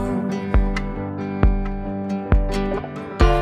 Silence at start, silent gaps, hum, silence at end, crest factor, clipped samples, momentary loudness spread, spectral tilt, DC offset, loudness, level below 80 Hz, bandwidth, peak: 0 s; none; none; 0 s; 18 dB; under 0.1%; 7 LU; -7.5 dB/octave; under 0.1%; -23 LUFS; -22 dBFS; 9.8 kHz; -2 dBFS